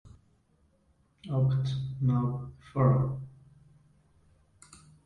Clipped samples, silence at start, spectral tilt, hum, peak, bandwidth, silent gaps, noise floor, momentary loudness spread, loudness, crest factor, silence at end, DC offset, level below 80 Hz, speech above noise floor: under 0.1%; 0.05 s; -9 dB/octave; none; -12 dBFS; 9.6 kHz; none; -68 dBFS; 15 LU; -29 LUFS; 20 dB; 0.3 s; under 0.1%; -56 dBFS; 40 dB